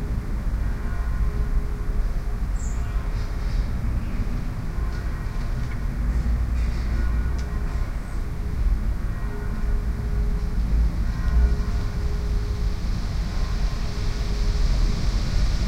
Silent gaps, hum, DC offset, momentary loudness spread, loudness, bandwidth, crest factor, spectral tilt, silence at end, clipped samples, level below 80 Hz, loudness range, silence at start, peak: none; none; under 0.1%; 5 LU; -28 LUFS; 10 kHz; 14 dB; -6.5 dB/octave; 0 s; under 0.1%; -24 dBFS; 3 LU; 0 s; -8 dBFS